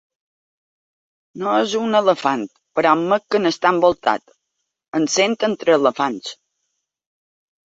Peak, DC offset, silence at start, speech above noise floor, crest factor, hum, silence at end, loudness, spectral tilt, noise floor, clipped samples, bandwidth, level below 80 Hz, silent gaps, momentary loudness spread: -2 dBFS; under 0.1%; 1.35 s; 59 dB; 18 dB; none; 1.3 s; -18 LUFS; -4 dB/octave; -77 dBFS; under 0.1%; 8 kHz; -64 dBFS; 4.88-4.92 s; 10 LU